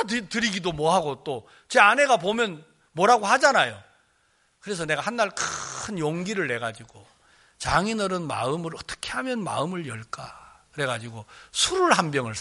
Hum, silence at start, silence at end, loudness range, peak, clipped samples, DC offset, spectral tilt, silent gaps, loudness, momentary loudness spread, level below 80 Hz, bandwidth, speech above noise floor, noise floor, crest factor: none; 0 s; 0 s; 8 LU; -2 dBFS; under 0.1%; under 0.1%; -3.5 dB/octave; none; -24 LUFS; 17 LU; -54 dBFS; 11.5 kHz; 41 dB; -66 dBFS; 24 dB